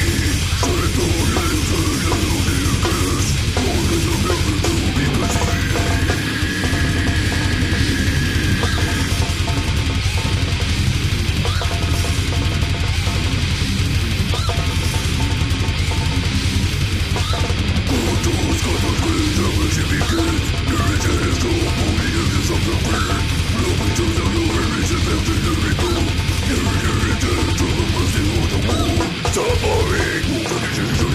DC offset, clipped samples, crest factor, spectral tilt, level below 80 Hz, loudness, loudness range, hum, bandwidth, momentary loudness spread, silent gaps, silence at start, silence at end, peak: under 0.1%; under 0.1%; 14 dB; -4.5 dB/octave; -24 dBFS; -18 LUFS; 1 LU; none; 15.5 kHz; 2 LU; none; 0 s; 0 s; -4 dBFS